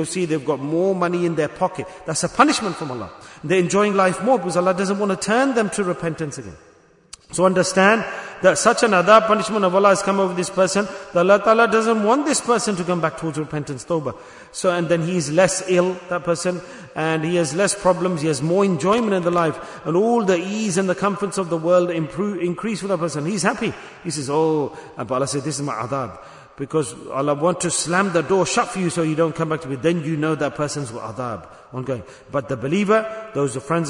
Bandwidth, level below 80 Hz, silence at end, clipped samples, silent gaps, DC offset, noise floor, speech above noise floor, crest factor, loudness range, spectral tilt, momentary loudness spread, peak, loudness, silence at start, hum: 11 kHz; -56 dBFS; 0 s; under 0.1%; none; under 0.1%; -46 dBFS; 26 dB; 20 dB; 7 LU; -4.5 dB/octave; 12 LU; 0 dBFS; -20 LUFS; 0 s; none